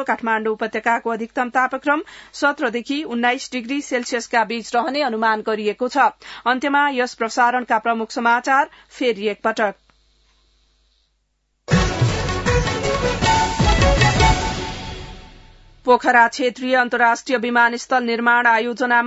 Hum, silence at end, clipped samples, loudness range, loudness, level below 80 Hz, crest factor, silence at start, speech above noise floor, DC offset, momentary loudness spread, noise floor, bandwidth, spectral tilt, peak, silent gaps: none; 0 s; under 0.1%; 5 LU; -19 LUFS; -32 dBFS; 18 dB; 0 s; 50 dB; under 0.1%; 9 LU; -69 dBFS; 8 kHz; -4.5 dB/octave; -2 dBFS; none